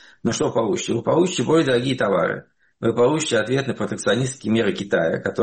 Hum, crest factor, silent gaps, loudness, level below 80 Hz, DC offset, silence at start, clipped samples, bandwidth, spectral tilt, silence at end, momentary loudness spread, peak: none; 14 dB; none; -21 LUFS; -56 dBFS; under 0.1%; 0.25 s; under 0.1%; 8.8 kHz; -5 dB/octave; 0 s; 6 LU; -8 dBFS